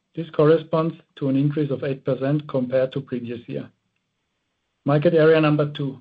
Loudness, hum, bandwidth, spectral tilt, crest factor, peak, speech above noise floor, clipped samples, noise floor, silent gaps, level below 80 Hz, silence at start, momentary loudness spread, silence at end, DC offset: -21 LUFS; none; 5 kHz; -10.5 dB/octave; 16 dB; -6 dBFS; 54 dB; under 0.1%; -75 dBFS; none; -64 dBFS; 0.15 s; 14 LU; 0 s; under 0.1%